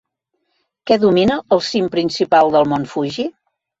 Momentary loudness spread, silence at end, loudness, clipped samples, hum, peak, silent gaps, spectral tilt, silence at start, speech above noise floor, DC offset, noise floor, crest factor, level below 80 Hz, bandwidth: 11 LU; 0.5 s; -16 LUFS; under 0.1%; none; -2 dBFS; none; -5.5 dB/octave; 0.85 s; 56 dB; under 0.1%; -71 dBFS; 16 dB; -52 dBFS; 8 kHz